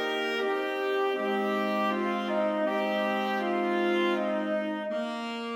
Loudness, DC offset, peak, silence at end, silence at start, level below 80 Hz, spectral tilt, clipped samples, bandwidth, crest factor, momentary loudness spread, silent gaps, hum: -29 LUFS; under 0.1%; -16 dBFS; 0 s; 0 s; -82 dBFS; -5.5 dB/octave; under 0.1%; 16.5 kHz; 12 dB; 5 LU; none; none